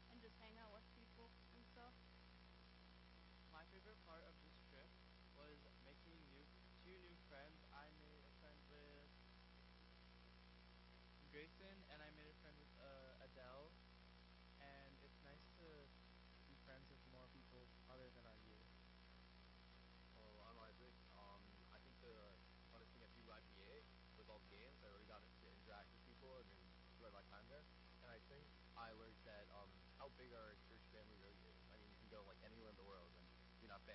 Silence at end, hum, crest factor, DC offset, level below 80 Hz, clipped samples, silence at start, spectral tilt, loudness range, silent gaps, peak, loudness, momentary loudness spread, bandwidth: 0 s; 60 Hz at -70 dBFS; 20 dB; under 0.1%; -70 dBFS; under 0.1%; 0 s; -3.5 dB/octave; 3 LU; none; -46 dBFS; -65 LUFS; 5 LU; 5.6 kHz